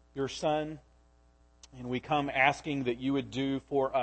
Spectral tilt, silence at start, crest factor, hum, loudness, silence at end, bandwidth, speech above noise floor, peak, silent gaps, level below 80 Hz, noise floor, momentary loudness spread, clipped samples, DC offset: -5.5 dB/octave; 0.15 s; 22 dB; 60 Hz at -60 dBFS; -31 LUFS; 0 s; 8.6 kHz; 32 dB; -10 dBFS; none; -60 dBFS; -63 dBFS; 11 LU; under 0.1%; under 0.1%